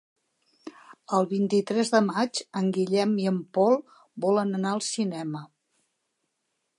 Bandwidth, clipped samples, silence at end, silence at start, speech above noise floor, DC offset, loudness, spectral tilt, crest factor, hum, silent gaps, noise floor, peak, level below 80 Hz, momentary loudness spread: 11.5 kHz; under 0.1%; 1.35 s; 0.65 s; 53 dB; under 0.1%; -26 LUFS; -5.5 dB/octave; 20 dB; none; none; -78 dBFS; -8 dBFS; -78 dBFS; 13 LU